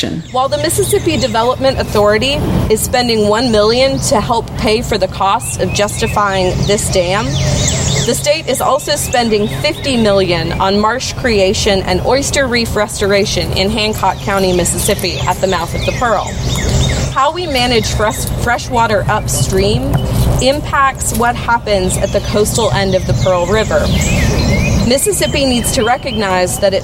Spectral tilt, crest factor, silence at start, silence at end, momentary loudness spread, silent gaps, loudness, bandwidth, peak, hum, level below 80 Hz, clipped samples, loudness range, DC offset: -4 dB/octave; 12 dB; 0 s; 0 s; 3 LU; none; -13 LUFS; 16.5 kHz; -2 dBFS; none; -24 dBFS; under 0.1%; 2 LU; under 0.1%